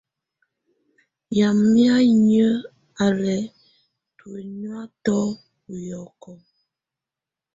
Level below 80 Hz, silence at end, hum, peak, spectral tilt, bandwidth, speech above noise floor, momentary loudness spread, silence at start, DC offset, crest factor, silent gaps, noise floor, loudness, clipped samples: -60 dBFS; 1.2 s; none; -6 dBFS; -6.5 dB/octave; 7.8 kHz; 69 dB; 22 LU; 1.3 s; under 0.1%; 16 dB; none; -88 dBFS; -19 LUFS; under 0.1%